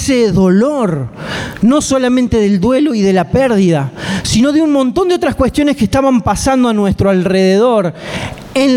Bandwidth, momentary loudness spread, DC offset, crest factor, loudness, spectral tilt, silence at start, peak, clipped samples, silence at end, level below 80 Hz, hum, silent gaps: 15.5 kHz; 8 LU; under 0.1%; 10 dB; -12 LUFS; -6 dB/octave; 0 s; -2 dBFS; under 0.1%; 0 s; -34 dBFS; none; none